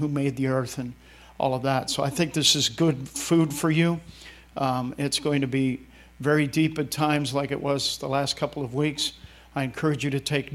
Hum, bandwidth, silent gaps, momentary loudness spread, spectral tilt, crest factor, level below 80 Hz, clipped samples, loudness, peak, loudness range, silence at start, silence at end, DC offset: none; 16 kHz; none; 9 LU; -4.5 dB/octave; 20 dB; -54 dBFS; under 0.1%; -25 LUFS; -6 dBFS; 3 LU; 0 s; 0 s; under 0.1%